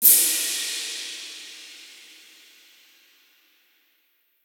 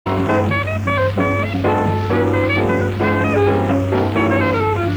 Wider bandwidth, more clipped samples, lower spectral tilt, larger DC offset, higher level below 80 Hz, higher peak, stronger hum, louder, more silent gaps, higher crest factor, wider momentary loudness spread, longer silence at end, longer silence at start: first, 17.5 kHz vs 9.2 kHz; neither; second, 3 dB/octave vs -7.5 dB/octave; neither; second, under -90 dBFS vs -40 dBFS; first, 0 dBFS vs -4 dBFS; neither; second, -21 LUFS vs -17 LUFS; neither; first, 26 dB vs 12 dB; first, 28 LU vs 2 LU; first, 2.6 s vs 0 s; about the same, 0 s vs 0.05 s